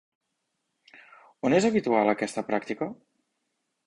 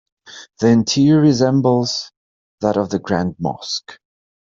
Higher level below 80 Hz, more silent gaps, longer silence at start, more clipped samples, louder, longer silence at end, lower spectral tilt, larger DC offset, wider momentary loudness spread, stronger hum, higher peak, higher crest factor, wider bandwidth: second, -66 dBFS vs -54 dBFS; second, none vs 2.17-2.58 s; first, 1.45 s vs 0.3 s; neither; second, -26 LUFS vs -17 LUFS; first, 0.95 s vs 0.65 s; about the same, -5.5 dB/octave vs -6 dB/octave; neither; about the same, 11 LU vs 12 LU; neither; second, -8 dBFS vs -2 dBFS; first, 20 dB vs 14 dB; first, 11.5 kHz vs 7.6 kHz